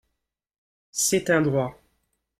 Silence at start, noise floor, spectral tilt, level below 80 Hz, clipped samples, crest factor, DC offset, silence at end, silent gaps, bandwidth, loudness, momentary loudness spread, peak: 0.95 s; -81 dBFS; -4 dB/octave; -60 dBFS; under 0.1%; 18 dB; under 0.1%; 0.7 s; none; 16 kHz; -24 LUFS; 12 LU; -8 dBFS